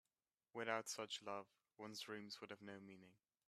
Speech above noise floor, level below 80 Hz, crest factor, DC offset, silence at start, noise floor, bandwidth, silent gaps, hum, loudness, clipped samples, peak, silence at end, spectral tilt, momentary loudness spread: over 39 dB; under -90 dBFS; 26 dB; under 0.1%; 0.55 s; under -90 dBFS; 14 kHz; none; none; -51 LUFS; under 0.1%; -26 dBFS; 0.35 s; -2.5 dB/octave; 15 LU